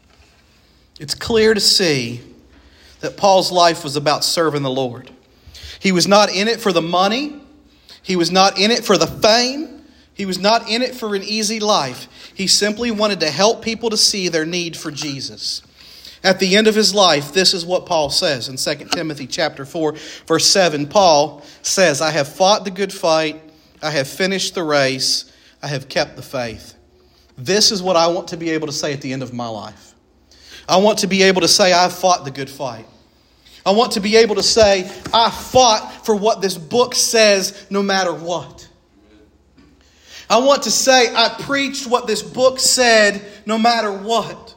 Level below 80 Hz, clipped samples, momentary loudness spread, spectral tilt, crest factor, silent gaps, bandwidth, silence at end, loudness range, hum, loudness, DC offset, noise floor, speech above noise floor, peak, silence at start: -52 dBFS; under 0.1%; 14 LU; -2.5 dB/octave; 18 dB; none; 16.5 kHz; 0.05 s; 4 LU; none; -16 LUFS; under 0.1%; -53 dBFS; 36 dB; 0 dBFS; 1 s